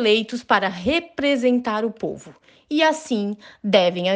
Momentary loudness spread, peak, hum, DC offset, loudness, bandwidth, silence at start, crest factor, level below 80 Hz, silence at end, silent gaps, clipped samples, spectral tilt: 12 LU; -4 dBFS; none; under 0.1%; -21 LUFS; 9.6 kHz; 0 s; 18 dB; -56 dBFS; 0 s; none; under 0.1%; -4.5 dB/octave